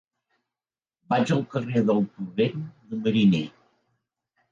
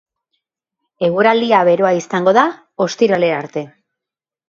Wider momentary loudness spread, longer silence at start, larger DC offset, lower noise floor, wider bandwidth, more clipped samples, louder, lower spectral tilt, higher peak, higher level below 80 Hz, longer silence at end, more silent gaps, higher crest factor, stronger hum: about the same, 11 LU vs 10 LU; about the same, 1.1 s vs 1 s; neither; about the same, under -90 dBFS vs -87 dBFS; about the same, 7.6 kHz vs 7.6 kHz; neither; second, -25 LUFS vs -15 LUFS; first, -7.5 dB/octave vs -5.5 dB/octave; second, -10 dBFS vs 0 dBFS; about the same, -66 dBFS vs -66 dBFS; first, 1 s vs 0.8 s; neither; about the same, 16 dB vs 16 dB; neither